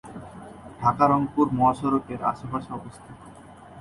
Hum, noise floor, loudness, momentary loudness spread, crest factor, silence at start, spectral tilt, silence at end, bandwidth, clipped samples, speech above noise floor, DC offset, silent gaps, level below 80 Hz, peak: none; -46 dBFS; -24 LUFS; 22 LU; 20 dB; 0.05 s; -8 dB/octave; 0 s; 11.5 kHz; under 0.1%; 22 dB; under 0.1%; none; -54 dBFS; -4 dBFS